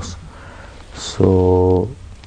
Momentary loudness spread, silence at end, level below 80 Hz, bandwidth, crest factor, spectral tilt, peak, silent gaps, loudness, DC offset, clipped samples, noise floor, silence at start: 24 LU; 0.05 s; -38 dBFS; 9.6 kHz; 18 dB; -7 dB/octave; 0 dBFS; none; -15 LUFS; under 0.1%; under 0.1%; -37 dBFS; 0 s